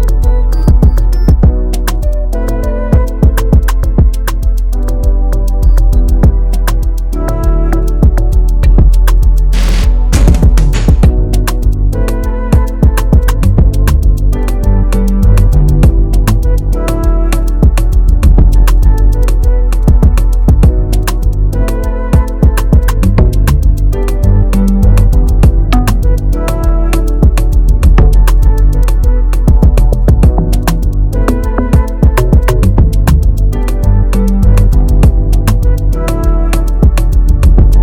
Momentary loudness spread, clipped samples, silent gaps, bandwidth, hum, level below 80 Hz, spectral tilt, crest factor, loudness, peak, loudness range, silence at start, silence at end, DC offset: 5 LU; under 0.1%; none; 15.5 kHz; none; -8 dBFS; -7 dB/octave; 6 dB; -11 LUFS; 0 dBFS; 2 LU; 0 s; 0 s; under 0.1%